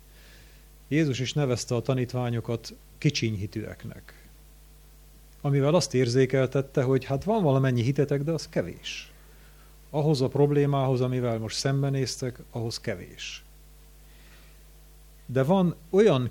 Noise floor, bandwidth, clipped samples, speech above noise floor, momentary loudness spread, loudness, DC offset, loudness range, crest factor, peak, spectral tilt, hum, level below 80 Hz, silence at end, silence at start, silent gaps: -51 dBFS; 18 kHz; under 0.1%; 26 dB; 13 LU; -26 LUFS; under 0.1%; 8 LU; 18 dB; -10 dBFS; -6 dB/octave; none; -52 dBFS; 0 s; 0.9 s; none